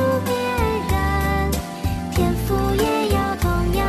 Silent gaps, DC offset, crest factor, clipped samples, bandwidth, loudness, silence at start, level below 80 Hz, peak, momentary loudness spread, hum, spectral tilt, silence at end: none; under 0.1%; 14 dB; under 0.1%; 14 kHz; -21 LUFS; 0 s; -28 dBFS; -6 dBFS; 4 LU; none; -6 dB/octave; 0 s